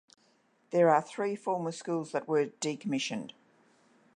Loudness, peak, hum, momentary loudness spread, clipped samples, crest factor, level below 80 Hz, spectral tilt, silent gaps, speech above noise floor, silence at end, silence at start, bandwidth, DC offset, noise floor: -31 LUFS; -12 dBFS; none; 10 LU; under 0.1%; 20 dB; -86 dBFS; -5 dB/octave; none; 38 dB; 0.85 s; 0.7 s; 10.5 kHz; under 0.1%; -69 dBFS